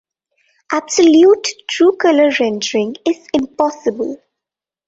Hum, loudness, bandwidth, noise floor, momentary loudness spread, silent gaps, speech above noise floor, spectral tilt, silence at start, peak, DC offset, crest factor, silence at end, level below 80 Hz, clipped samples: none; -14 LUFS; 8 kHz; -86 dBFS; 12 LU; none; 72 dB; -3 dB/octave; 0.7 s; -2 dBFS; under 0.1%; 14 dB; 0.7 s; -58 dBFS; under 0.1%